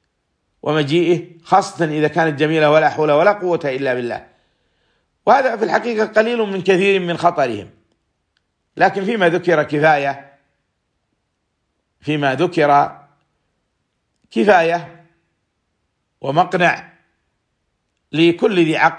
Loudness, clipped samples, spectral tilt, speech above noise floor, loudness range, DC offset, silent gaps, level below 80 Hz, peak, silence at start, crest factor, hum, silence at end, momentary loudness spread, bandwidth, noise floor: -16 LUFS; under 0.1%; -6 dB/octave; 56 dB; 5 LU; under 0.1%; none; -64 dBFS; 0 dBFS; 0.65 s; 18 dB; none; 0 s; 10 LU; 10 kHz; -71 dBFS